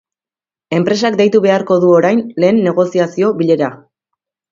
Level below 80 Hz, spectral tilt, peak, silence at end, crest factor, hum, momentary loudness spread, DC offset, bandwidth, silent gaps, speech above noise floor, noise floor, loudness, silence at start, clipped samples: -60 dBFS; -6.5 dB/octave; 0 dBFS; 0.75 s; 14 dB; none; 5 LU; under 0.1%; 7.6 kHz; none; over 78 dB; under -90 dBFS; -13 LUFS; 0.7 s; under 0.1%